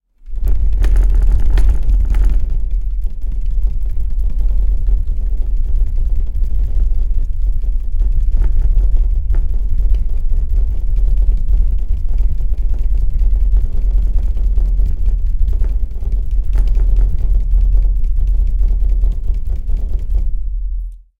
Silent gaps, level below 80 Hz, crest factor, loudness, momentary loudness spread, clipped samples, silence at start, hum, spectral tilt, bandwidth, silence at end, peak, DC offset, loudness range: none; -12 dBFS; 12 dB; -20 LUFS; 6 LU; under 0.1%; 0.25 s; none; -8.5 dB/octave; 2.1 kHz; 0.25 s; 0 dBFS; under 0.1%; 3 LU